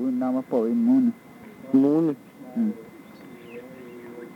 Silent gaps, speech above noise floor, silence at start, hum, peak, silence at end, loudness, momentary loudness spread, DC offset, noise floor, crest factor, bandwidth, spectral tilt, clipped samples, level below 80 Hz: none; 23 dB; 0 s; none; -8 dBFS; 0 s; -23 LUFS; 23 LU; under 0.1%; -44 dBFS; 16 dB; 5.6 kHz; -9 dB/octave; under 0.1%; -74 dBFS